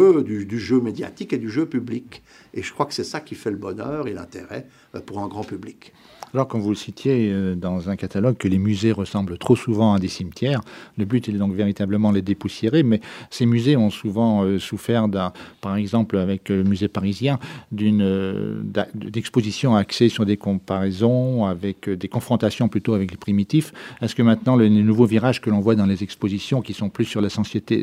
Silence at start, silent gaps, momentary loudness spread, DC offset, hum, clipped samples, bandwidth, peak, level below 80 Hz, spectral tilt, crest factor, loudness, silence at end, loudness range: 0 s; none; 12 LU; under 0.1%; none; under 0.1%; 13.5 kHz; -4 dBFS; -56 dBFS; -7 dB/octave; 18 dB; -21 LUFS; 0 s; 9 LU